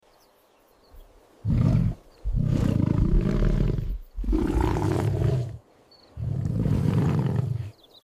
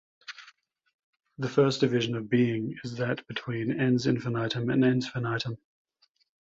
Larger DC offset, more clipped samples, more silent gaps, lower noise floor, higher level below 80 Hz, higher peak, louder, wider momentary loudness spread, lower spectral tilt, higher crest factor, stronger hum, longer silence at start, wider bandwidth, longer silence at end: neither; neither; second, none vs 0.94-1.13 s; about the same, -60 dBFS vs -60 dBFS; first, -30 dBFS vs -66 dBFS; about the same, -8 dBFS vs -8 dBFS; about the same, -26 LUFS vs -28 LUFS; about the same, 12 LU vs 13 LU; first, -9 dB/octave vs -6.5 dB/octave; about the same, 16 dB vs 20 dB; neither; first, 0.95 s vs 0.3 s; first, 13.5 kHz vs 7.8 kHz; second, 0.35 s vs 0.9 s